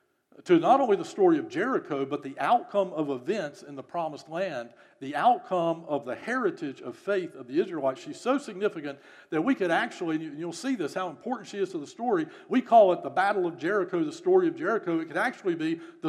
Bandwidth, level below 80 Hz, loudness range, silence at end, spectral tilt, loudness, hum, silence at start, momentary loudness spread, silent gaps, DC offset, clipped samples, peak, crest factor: 11.5 kHz; -86 dBFS; 5 LU; 0 s; -6 dB/octave; -28 LUFS; none; 0.4 s; 12 LU; none; under 0.1%; under 0.1%; -8 dBFS; 20 dB